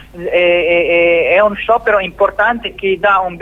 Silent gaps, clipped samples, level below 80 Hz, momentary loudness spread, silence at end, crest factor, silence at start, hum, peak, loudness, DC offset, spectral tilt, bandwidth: none; under 0.1%; -40 dBFS; 5 LU; 0 s; 12 dB; 0 s; none; 0 dBFS; -12 LUFS; under 0.1%; -6 dB/octave; 4 kHz